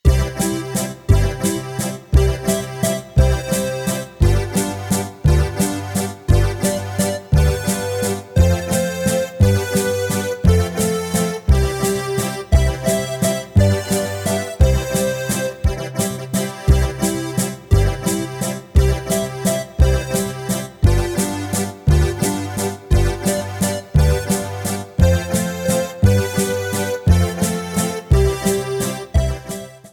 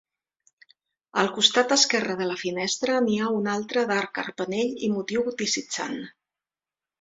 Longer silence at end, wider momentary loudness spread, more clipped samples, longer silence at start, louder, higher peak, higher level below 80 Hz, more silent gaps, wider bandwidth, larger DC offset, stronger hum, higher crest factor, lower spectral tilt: second, 0.05 s vs 0.9 s; second, 6 LU vs 11 LU; neither; second, 0.05 s vs 1.15 s; first, -19 LUFS vs -24 LUFS; about the same, -2 dBFS vs -4 dBFS; first, -22 dBFS vs -68 dBFS; neither; first, 19 kHz vs 8 kHz; neither; neither; second, 16 dB vs 24 dB; first, -5.5 dB/octave vs -2.5 dB/octave